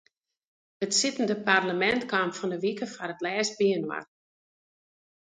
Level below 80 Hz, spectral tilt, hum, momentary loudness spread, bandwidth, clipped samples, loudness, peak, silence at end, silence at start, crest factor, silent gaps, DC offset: -70 dBFS; -3 dB/octave; none; 11 LU; 9.6 kHz; under 0.1%; -27 LUFS; -6 dBFS; 1.2 s; 0.8 s; 22 dB; none; under 0.1%